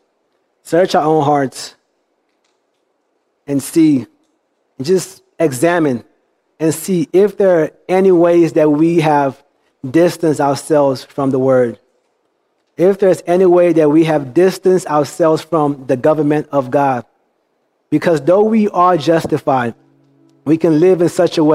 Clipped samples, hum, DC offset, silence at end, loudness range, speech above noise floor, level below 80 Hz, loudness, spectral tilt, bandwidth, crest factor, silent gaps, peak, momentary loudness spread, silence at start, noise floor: under 0.1%; none; under 0.1%; 0 s; 6 LU; 52 dB; -60 dBFS; -13 LUFS; -6.5 dB/octave; 15.5 kHz; 14 dB; none; 0 dBFS; 8 LU; 0.65 s; -65 dBFS